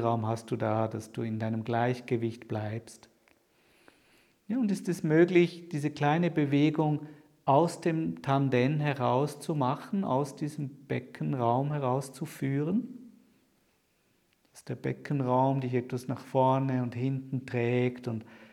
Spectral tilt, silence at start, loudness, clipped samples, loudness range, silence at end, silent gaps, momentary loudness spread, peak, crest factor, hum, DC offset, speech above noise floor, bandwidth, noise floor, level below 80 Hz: -7.5 dB/octave; 0 s; -30 LUFS; under 0.1%; 7 LU; 0.05 s; none; 10 LU; -10 dBFS; 20 dB; none; under 0.1%; 42 dB; 14 kHz; -71 dBFS; -74 dBFS